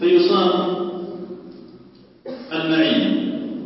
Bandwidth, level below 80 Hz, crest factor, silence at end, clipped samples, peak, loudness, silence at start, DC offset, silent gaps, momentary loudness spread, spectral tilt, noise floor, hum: 5.8 kHz; -66 dBFS; 16 dB; 0 s; under 0.1%; -6 dBFS; -19 LUFS; 0 s; under 0.1%; none; 20 LU; -9.5 dB/octave; -47 dBFS; none